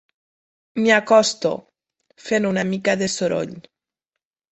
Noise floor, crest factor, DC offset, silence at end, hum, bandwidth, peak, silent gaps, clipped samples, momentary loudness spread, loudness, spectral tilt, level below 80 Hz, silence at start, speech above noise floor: -84 dBFS; 20 dB; under 0.1%; 0.9 s; none; 8.4 kHz; -2 dBFS; none; under 0.1%; 17 LU; -19 LUFS; -4 dB/octave; -62 dBFS; 0.75 s; 65 dB